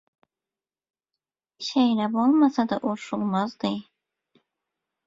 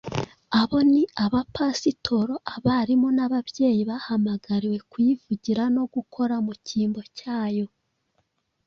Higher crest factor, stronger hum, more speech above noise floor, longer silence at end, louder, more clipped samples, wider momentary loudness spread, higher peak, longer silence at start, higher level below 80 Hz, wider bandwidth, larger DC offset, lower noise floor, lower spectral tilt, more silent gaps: about the same, 18 dB vs 18 dB; neither; first, over 67 dB vs 49 dB; first, 1.25 s vs 1 s; about the same, -24 LUFS vs -24 LUFS; neither; about the same, 10 LU vs 8 LU; about the same, -8 dBFS vs -8 dBFS; first, 1.6 s vs 0.05 s; second, -70 dBFS vs -56 dBFS; about the same, 7.8 kHz vs 7.4 kHz; neither; first, under -90 dBFS vs -72 dBFS; about the same, -6 dB/octave vs -6 dB/octave; neither